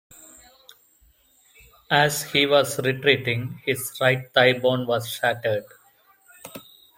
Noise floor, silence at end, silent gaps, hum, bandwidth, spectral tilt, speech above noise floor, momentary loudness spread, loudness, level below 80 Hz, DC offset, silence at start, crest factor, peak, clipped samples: -59 dBFS; 0.35 s; none; none; 16.5 kHz; -4 dB/octave; 38 dB; 11 LU; -22 LUFS; -64 dBFS; under 0.1%; 1.9 s; 22 dB; -2 dBFS; under 0.1%